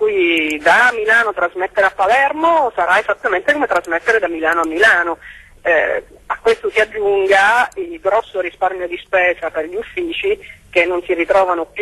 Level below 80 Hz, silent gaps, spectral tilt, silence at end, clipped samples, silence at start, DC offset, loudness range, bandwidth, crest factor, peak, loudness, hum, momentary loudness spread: -50 dBFS; none; -3 dB/octave; 0 s; under 0.1%; 0 s; under 0.1%; 4 LU; 12.5 kHz; 14 dB; -2 dBFS; -15 LUFS; none; 10 LU